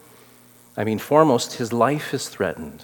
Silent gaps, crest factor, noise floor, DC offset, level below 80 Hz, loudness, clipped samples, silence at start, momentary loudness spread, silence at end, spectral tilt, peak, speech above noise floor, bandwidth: none; 22 dB; -51 dBFS; under 0.1%; -62 dBFS; -21 LUFS; under 0.1%; 0.75 s; 11 LU; 0 s; -5 dB/octave; 0 dBFS; 30 dB; 18 kHz